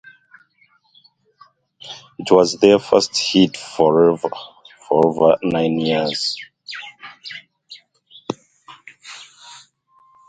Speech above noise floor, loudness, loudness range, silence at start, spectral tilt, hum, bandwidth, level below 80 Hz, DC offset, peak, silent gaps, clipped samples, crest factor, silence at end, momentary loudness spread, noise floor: 43 dB; -16 LUFS; 19 LU; 1.85 s; -4.5 dB/octave; none; 9.4 kHz; -60 dBFS; under 0.1%; 0 dBFS; none; under 0.1%; 20 dB; 0.75 s; 23 LU; -59 dBFS